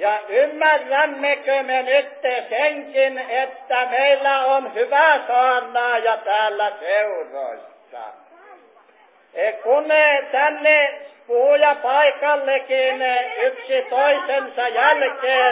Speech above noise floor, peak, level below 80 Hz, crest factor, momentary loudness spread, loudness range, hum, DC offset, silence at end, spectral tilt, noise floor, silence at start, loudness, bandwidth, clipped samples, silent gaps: 35 dB; -4 dBFS; under -90 dBFS; 16 dB; 9 LU; 6 LU; none; under 0.1%; 0 s; -3.5 dB/octave; -53 dBFS; 0 s; -18 LUFS; 4 kHz; under 0.1%; none